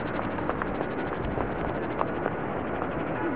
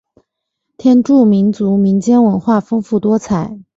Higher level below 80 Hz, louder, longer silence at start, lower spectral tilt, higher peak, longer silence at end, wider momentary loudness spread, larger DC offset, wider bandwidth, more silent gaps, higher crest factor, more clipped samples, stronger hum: first, -44 dBFS vs -50 dBFS; second, -30 LUFS vs -13 LUFS; second, 0 s vs 0.85 s; second, -6 dB/octave vs -8.5 dB/octave; second, -8 dBFS vs -2 dBFS; second, 0 s vs 0.15 s; second, 1 LU vs 7 LU; first, 0.6% vs under 0.1%; second, 4 kHz vs 7.8 kHz; neither; first, 22 dB vs 12 dB; neither; neither